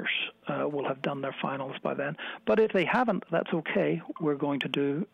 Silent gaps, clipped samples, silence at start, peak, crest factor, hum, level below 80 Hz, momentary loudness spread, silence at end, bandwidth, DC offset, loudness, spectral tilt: none; under 0.1%; 0 s; -16 dBFS; 14 dB; none; -70 dBFS; 8 LU; 0.1 s; 9.4 kHz; under 0.1%; -30 LUFS; -7 dB/octave